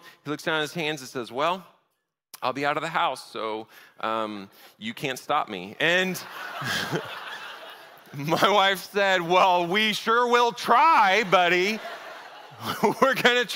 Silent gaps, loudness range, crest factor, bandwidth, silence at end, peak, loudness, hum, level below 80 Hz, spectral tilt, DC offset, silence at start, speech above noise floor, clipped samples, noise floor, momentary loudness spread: none; 9 LU; 22 dB; 16 kHz; 0 s; -4 dBFS; -23 LUFS; none; -72 dBFS; -3.5 dB/octave; under 0.1%; 0.05 s; 53 dB; under 0.1%; -77 dBFS; 17 LU